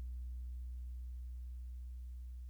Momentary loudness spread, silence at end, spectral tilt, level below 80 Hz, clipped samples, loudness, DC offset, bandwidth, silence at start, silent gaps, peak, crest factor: 3 LU; 0 s; -7 dB/octave; -46 dBFS; under 0.1%; -49 LUFS; under 0.1%; 19 kHz; 0 s; none; -40 dBFS; 6 dB